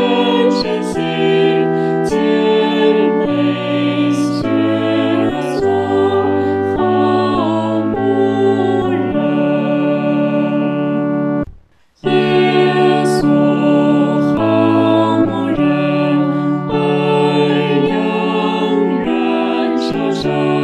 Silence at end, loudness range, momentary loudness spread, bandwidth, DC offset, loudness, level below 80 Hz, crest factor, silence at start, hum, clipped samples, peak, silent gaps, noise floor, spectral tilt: 0 s; 2 LU; 4 LU; 11 kHz; under 0.1%; -14 LUFS; -46 dBFS; 14 dB; 0 s; none; under 0.1%; 0 dBFS; none; -45 dBFS; -7 dB/octave